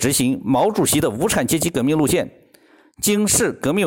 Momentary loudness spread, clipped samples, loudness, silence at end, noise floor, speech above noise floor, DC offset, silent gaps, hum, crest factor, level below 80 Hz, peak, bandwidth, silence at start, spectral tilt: 4 LU; under 0.1%; -18 LUFS; 0 s; -52 dBFS; 34 dB; under 0.1%; none; none; 12 dB; -46 dBFS; -6 dBFS; 17 kHz; 0 s; -4 dB/octave